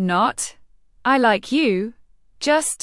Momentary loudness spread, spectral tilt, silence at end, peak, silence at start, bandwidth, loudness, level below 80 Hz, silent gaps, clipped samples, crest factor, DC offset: 11 LU; -3.5 dB/octave; 0.05 s; -4 dBFS; 0 s; 12 kHz; -20 LUFS; -58 dBFS; none; under 0.1%; 16 dB; under 0.1%